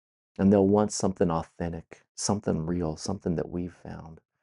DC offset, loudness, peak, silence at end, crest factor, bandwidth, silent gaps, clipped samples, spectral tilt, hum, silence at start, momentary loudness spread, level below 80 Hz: under 0.1%; -27 LUFS; -8 dBFS; 0.25 s; 20 dB; 11.5 kHz; 2.09-2.15 s; under 0.1%; -6 dB/octave; none; 0.4 s; 21 LU; -54 dBFS